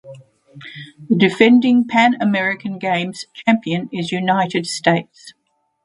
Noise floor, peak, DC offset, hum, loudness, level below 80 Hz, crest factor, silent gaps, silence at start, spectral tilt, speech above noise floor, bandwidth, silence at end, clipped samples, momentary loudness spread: -41 dBFS; 0 dBFS; under 0.1%; none; -17 LUFS; -64 dBFS; 18 dB; none; 0.05 s; -5.5 dB/octave; 24 dB; 11 kHz; 0.55 s; under 0.1%; 13 LU